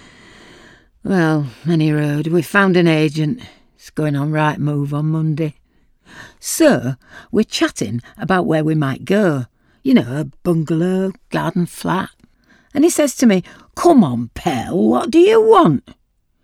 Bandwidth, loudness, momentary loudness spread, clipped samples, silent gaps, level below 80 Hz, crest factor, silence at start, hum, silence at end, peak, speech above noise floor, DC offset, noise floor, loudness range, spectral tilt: 16.5 kHz; -16 LUFS; 13 LU; under 0.1%; none; -50 dBFS; 16 dB; 1.05 s; none; 0.65 s; 0 dBFS; 38 dB; under 0.1%; -53 dBFS; 5 LU; -6 dB/octave